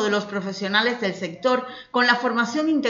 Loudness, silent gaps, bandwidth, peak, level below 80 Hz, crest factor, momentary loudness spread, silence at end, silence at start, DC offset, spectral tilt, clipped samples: -22 LUFS; none; 7.6 kHz; -4 dBFS; -68 dBFS; 20 dB; 8 LU; 0 s; 0 s; under 0.1%; -4 dB/octave; under 0.1%